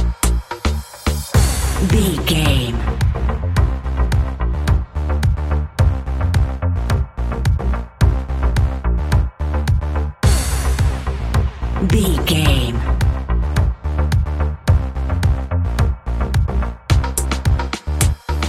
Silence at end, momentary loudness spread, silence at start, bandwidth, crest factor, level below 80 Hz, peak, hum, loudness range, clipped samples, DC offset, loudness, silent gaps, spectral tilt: 0 s; 5 LU; 0 s; 15.5 kHz; 16 dB; -20 dBFS; -2 dBFS; none; 2 LU; under 0.1%; under 0.1%; -19 LUFS; none; -5.5 dB/octave